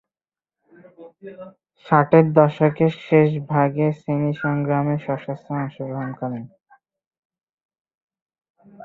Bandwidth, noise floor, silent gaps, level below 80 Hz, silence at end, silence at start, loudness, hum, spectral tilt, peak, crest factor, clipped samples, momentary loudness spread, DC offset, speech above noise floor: 4.6 kHz; under -90 dBFS; 7.07-7.11 s, 7.18-7.30 s, 7.43-7.58 s, 7.65-7.69 s, 7.80-7.85 s, 7.97-8.08 s, 8.22-8.26 s, 8.50-8.54 s; -62 dBFS; 0 s; 1 s; -20 LUFS; none; -10 dB/octave; -2 dBFS; 20 dB; under 0.1%; 15 LU; under 0.1%; over 70 dB